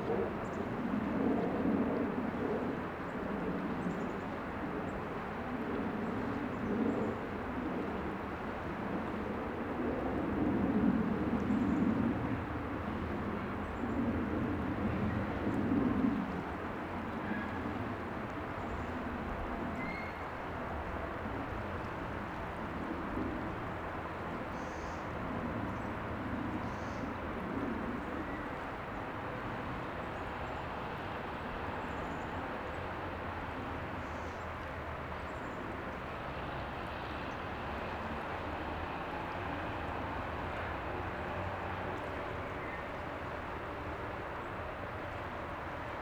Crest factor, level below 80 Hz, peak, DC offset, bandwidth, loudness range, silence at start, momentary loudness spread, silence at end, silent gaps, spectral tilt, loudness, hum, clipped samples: 18 dB; -50 dBFS; -18 dBFS; under 0.1%; over 20 kHz; 6 LU; 0 s; 8 LU; 0 s; none; -7.5 dB/octave; -38 LUFS; none; under 0.1%